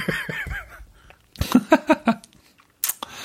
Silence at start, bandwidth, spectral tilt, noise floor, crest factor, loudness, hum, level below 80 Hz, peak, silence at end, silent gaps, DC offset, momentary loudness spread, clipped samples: 0 s; 16.5 kHz; -4.5 dB/octave; -56 dBFS; 22 dB; -23 LUFS; none; -42 dBFS; -2 dBFS; 0 s; none; under 0.1%; 14 LU; under 0.1%